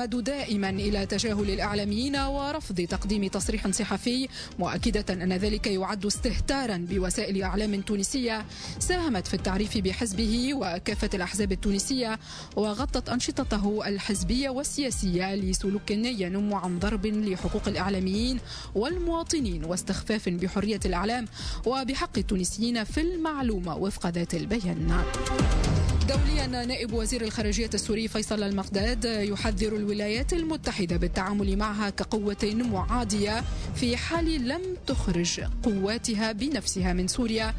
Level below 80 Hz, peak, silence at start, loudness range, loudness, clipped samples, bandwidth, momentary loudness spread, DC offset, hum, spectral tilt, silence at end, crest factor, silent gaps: -36 dBFS; -14 dBFS; 0 s; 1 LU; -28 LUFS; under 0.1%; 11 kHz; 3 LU; under 0.1%; none; -4.5 dB/octave; 0 s; 14 dB; none